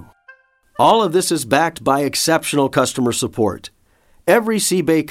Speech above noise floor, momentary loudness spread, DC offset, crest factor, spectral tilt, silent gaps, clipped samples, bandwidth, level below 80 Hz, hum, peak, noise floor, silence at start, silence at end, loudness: 38 dB; 7 LU; under 0.1%; 16 dB; -4 dB/octave; none; under 0.1%; 17 kHz; -54 dBFS; none; -2 dBFS; -54 dBFS; 0 s; 0 s; -17 LUFS